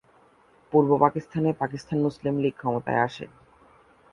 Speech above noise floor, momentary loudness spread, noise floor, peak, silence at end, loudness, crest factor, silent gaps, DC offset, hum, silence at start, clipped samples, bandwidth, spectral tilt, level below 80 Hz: 34 dB; 8 LU; -59 dBFS; -4 dBFS; 0.85 s; -25 LUFS; 22 dB; none; under 0.1%; none; 0.7 s; under 0.1%; 10.5 kHz; -8 dB/octave; -60 dBFS